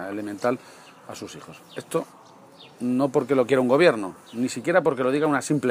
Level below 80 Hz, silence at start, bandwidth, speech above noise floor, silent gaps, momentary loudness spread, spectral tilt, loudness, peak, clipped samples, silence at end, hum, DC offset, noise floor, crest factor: -72 dBFS; 0 s; 15.5 kHz; 25 dB; none; 20 LU; -5.5 dB/octave; -23 LUFS; -4 dBFS; under 0.1%; 0 s; none; under 0.1%; -49 dBFS; 20 dB